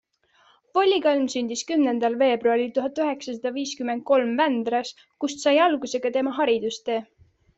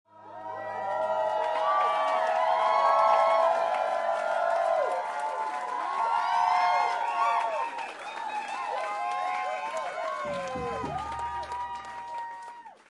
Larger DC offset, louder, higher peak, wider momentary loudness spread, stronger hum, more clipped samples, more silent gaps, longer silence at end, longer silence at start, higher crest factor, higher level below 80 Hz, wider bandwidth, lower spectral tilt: neither; first, -23 LUFS vs -28 LUFS; first, -8 dBFS vs -12 dBFS; second, 9 LU vs 13 LU; neither; neither; neither; first, 0.55 s vs 0.15 s; first, 0.75 s vs 0.15 s; about the same, 16 dB vs 16 dB; second, -70 dBFS vs -64 dBFS; second, 8.2 kHz vs 11.5 kHz; about the same, -3 dB/octave vs -3 dB/octave